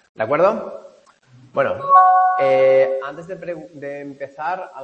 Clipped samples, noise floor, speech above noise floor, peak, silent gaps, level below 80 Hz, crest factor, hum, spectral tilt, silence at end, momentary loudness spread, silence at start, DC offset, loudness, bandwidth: under 0.1%; -50 dBFS; 33 dB; -2 dBFS; none; -68 dBFS; 18 dB; none; -6.5 dB/octave; 0 s; 19 LU; 0.2 s; under 0.1%; -16 LUFS; 6.6 kHz